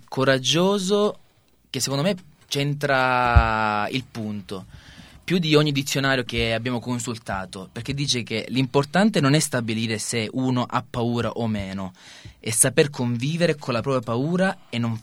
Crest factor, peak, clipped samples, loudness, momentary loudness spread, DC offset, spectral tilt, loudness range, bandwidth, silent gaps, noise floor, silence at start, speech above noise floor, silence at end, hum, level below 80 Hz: 22 dB; 0 dBFS; under 0.1%; -22 LUFS; 13 LU; under 0.1%; -4.5 dB/octave; 2 LU; 16.5 kHz; none; -59 dBFS; 0.1 s; 36 dB; 0 s; none; -38 dBFS